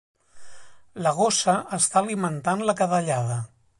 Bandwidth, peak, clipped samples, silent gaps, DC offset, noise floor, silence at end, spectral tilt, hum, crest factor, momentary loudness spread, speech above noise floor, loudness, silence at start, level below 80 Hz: 11.5 kHz; -8 dBFS; under 0.1%; none; under 0.1%; -43 dBFS; 0.3 s; -4 dB/octave; none; 18 dB; 7 LU; 20 dB; -23 LUFS; 0.35 s; -64 dBFS